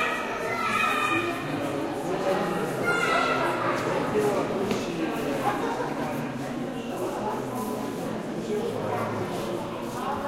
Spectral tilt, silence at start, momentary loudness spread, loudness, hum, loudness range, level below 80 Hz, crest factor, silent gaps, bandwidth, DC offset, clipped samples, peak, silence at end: -5 dB/octave; 0 s; 8 LU; -28 LUFS; none; 5 LU; -56 dBFS; 16 dB; none; 16 kHz; under 0.1%; under 0.1%; -10 dBFS; 0 s